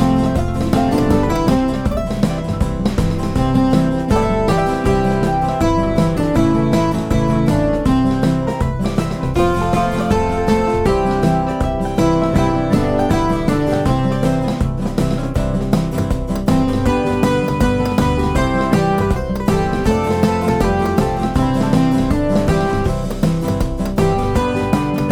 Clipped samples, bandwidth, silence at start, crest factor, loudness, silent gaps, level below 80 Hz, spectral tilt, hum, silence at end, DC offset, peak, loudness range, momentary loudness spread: under 0.1%; 17 kHz; 0 s; 14 dB; -17 LUFS; none; -26 dBFS; -7 dB/octave; none; 0 s; under 0.1%; -2 dBFS; 1 LU; 4 LU